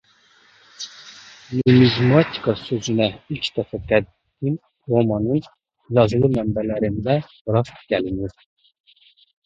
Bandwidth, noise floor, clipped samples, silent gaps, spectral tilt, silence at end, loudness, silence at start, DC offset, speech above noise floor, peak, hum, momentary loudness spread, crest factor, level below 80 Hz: 7.6 kHz; -56 dBFS; under 0.1%; 7.41-7.45 s; -7 dB/octave; 1.15 s; -20 LUFS; 0.8 s; under 0.1%; 36 dB; 0 dBFS; none; 17 LU; 20 dB; -46 dBFS